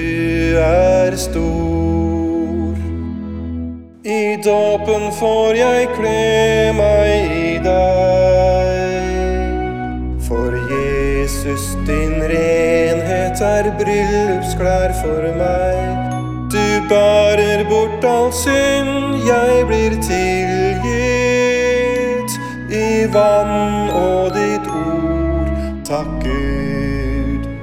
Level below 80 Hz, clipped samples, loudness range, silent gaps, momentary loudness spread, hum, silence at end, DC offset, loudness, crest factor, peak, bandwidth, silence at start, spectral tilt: -26 dBFS; under 0.1%; 5 LU; none; 8 LU; none; 0 s; under 0.1%; -16 LUFS; 14 dB; 0 dBFS; 17 kHz; 0 s; -5.5 dB/octave